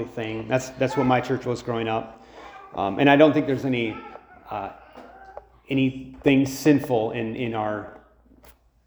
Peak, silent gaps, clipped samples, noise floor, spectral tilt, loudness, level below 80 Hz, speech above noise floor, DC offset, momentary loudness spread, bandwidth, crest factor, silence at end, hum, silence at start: -2 dBFS; none; under 0.1%; -54 dBFS; -6 dB/octave; -23 LUFS; -54 dBFS; 31 dB; under 0.1%; 23 LU; over 20 kHz; 22 dB; 0.9 s; none; 0 s